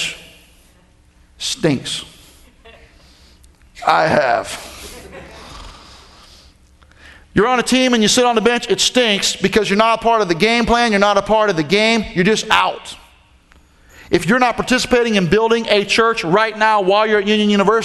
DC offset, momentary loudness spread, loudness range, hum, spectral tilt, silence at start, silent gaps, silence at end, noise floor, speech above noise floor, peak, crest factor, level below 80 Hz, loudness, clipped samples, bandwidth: under 0.1%; 17 LU; 10 LU; none; -3.5 dB/octave; 0 s; none; 0 s; -51 dBFS; 36 dB; 0 dBFS; 16 dB; -42 dBFS; -15 LUFS; under 0.1%; 12.5 kHz